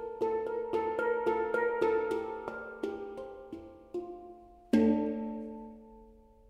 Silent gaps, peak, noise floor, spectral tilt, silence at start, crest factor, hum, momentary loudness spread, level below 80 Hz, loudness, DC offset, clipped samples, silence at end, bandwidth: none; -14 dBFS; -57 dBFS; -7 dB/octave; 0 s; 20 dB; none; 19 LU; -62 dBFS; -33 LUFS; under 0.1%; under 0.1%; 0.35 s; 11 kHz